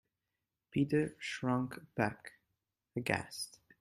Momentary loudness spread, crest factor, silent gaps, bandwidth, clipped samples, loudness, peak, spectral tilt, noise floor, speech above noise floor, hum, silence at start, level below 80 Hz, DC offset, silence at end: 12 LU; 24 dB; none; 14 kHz; under 0.1%; -37 LUFS; -14 dBFS; -5.5 dB/octave; -89 dBFS; 53 dB; none; 0.75 s; -70 dBFS; under 0.1%; 0.3 s